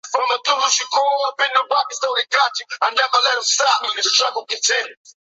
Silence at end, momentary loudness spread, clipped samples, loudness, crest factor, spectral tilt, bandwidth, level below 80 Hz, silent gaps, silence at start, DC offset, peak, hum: 0.3 s; 5 LU; under 0.1%; -17 LUFS; 18 dB; 4 dB/octave; 8.4 kHz; -84 dBFS; none; 0.05 s; under 0.1%; -2 dBFS; none